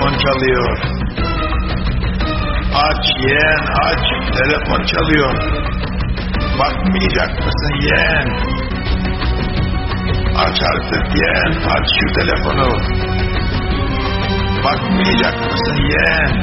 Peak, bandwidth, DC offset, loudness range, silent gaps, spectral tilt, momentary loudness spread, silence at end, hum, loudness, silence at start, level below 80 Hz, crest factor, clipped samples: 0 dBFS; 6 kHz; under 0.1%; 2 LU; none; -3.5 dB/octave; 6 LU; 0 s; none; -15 LUFS; 0 s; -22 dBFS; 14 dB; under 0.1%